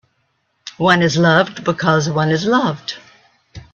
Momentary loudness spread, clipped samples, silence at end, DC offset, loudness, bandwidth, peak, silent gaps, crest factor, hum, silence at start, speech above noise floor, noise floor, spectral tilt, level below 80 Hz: 18 LU; under 0.1%; 0.1 s; under 0.1%; -15 LUFS; 7.4 kHz; 0 dBFS; none; 18 dB; none; 0.65 s; 51 dB; -66 dBFS; -5.5 dB/octave; -54 dBFS